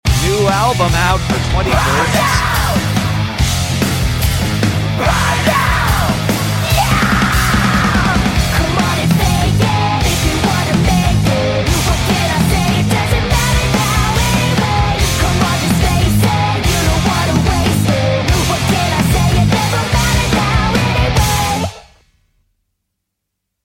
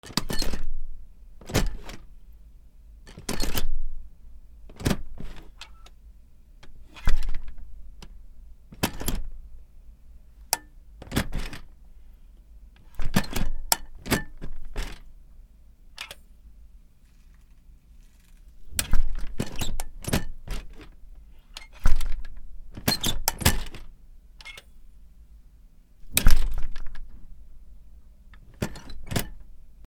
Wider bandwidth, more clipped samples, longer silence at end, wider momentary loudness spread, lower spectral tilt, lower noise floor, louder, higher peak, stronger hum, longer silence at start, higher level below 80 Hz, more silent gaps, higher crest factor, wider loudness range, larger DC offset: about the same, 17 kHz vs 17 kHz; neither; first, 1.85 s vs 0.2 s; second, 3 LU vs 26 LU; about the same, -4.5 dB/octave vs -3.5 dB/octave; first, -75 dBFS vs -52 dBFS; first, -13 LUFS vs -30 LUFS; about the same, 0 dBFS vs 0 dBFS; neither; about the same, 0.05 s vs 0.05 s; first, -22 dBFS vs -30 dBFS; neither; second, 12 dB vs 24 dB; second, 1 LU vs 9 LU; neither